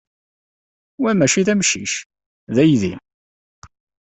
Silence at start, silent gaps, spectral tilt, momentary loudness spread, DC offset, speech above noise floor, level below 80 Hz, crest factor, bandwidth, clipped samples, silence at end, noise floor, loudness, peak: 1 s; 2.06-2.10 s, 2.26-2.47 s; -4 dB/octave; 11 LU; under 0.1%; over 73 dB; -56 dBFS; 18 dB; 8.4 kHz; under 0.1%; 1.05 s; under -90 dBFS; -17 LUFS; -2 dBFS